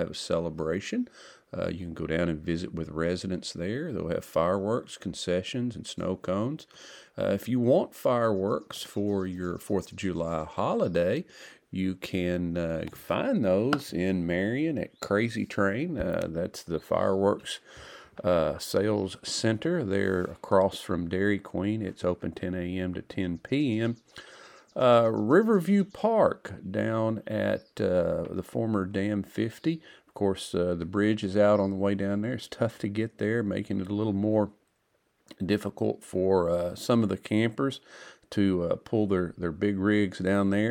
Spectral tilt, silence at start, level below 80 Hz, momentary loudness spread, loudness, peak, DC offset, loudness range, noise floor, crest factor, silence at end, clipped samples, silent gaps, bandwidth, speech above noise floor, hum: -6.5 dB/octave; 0 s; -56 dBFS; 9 LU; -28 LUFS; -8 dBFS; under 0.1%; 5 LU; -72 dBFS; 20 dB; 0 s; under 0.1%; none; 19 kHz; 45 dB; none